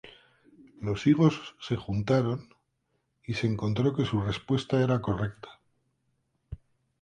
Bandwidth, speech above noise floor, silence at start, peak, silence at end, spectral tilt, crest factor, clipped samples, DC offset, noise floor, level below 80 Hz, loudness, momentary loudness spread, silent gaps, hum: 9.6 kHz; 49 dB; 0.05 s; -10 dBFS; 0.45 s; -7.5 dB/octave; 20 dB; under 0.1%; under 0.1%; -77 dBFS; -54 dBFS; -28 LUFS; 23 LU; none; none